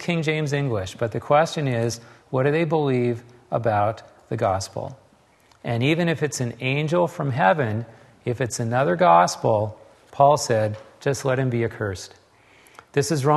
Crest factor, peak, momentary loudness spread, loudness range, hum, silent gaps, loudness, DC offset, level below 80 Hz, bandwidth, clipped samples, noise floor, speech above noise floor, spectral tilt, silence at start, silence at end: 20 dB; -2 dBFS; 14 LU; 4 LU; none; none; -22 LUFS; under 0.1%; -60 dBFS; 12.5 kHz; under 0.1%; -57 dBFS; 35 dB; -5.5 dB/octave; 0 s; 0 s